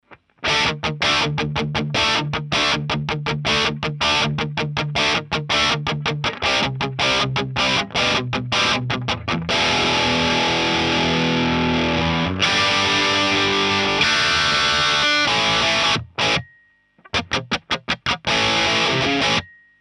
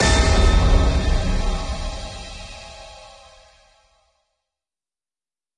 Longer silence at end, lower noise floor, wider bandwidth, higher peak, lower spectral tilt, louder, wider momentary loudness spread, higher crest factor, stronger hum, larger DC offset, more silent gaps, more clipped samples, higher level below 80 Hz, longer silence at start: second, 0.35 s vs 2.55 s; second, -57 dBFS vs under -90 dBFS; about the same, 11.5 kHz vs 11 kHz; about the same, -4 dBFS vs -4 dBFS; about the same, -3.5 dB/octave vs -4.5 dB/octave; about the same, -18 LUFS vs -20 LUFS; second, 7 LU vs 22 LU; about the same, 16 dB vs 16 dB; neither; neither; neither; neither; second, -44 dBFS vs -22 dBFS; about the same, 0.1 s vs 0 s